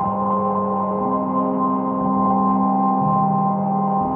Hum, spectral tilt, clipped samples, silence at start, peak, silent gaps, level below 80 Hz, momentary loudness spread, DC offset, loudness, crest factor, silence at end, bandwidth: none; -11.5 dB/octave; under 0.1%; 0 s; -8 dBFS; none; -54 dBFS; 3 LU; under 0.1%; -19 LUFS; 12 dB; 0 s; 3 kHz